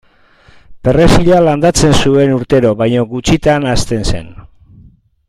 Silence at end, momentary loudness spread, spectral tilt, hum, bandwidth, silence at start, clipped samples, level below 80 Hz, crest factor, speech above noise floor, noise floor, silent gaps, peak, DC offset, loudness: 0.95 s; 8 LU; -5.5 dB/octave; none; 15.5 kHz; 0.7 s; under 0.1%; -24 dBFS; 12 dB; 36 dB; -46 dBFS; none; 0 dBFS; under 0.1%; -11 LUFS